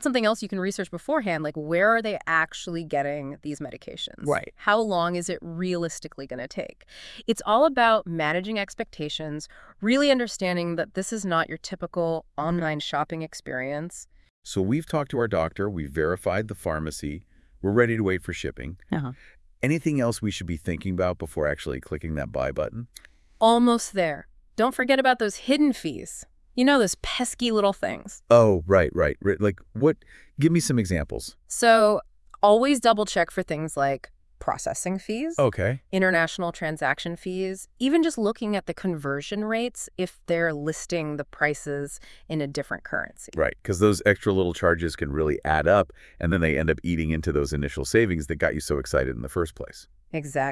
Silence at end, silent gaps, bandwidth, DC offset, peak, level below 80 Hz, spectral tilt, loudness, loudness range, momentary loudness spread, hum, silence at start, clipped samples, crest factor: 0 s; 14.30-14.42 s; 12 kHz; under 0.1%; -4 dBFS; -46 dBFS; -5 dB/octave; -25 LUFS; 6 LU; 13 LU; none; 0 s; under 0.1%; 22 dB